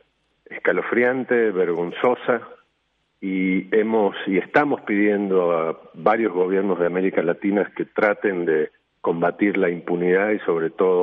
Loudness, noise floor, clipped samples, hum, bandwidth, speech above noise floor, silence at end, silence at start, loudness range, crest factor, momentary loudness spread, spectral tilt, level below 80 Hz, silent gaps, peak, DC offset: -21 LUFS; -70 dBFS; under 0.1%; none; 4.4 kHz; 49 dB; 0 s; 0.5 s; 2 LU; 16 dB; 5 LU; -9 dB/octave; -70 dBFS; none; -4 dBFS; under 0.1%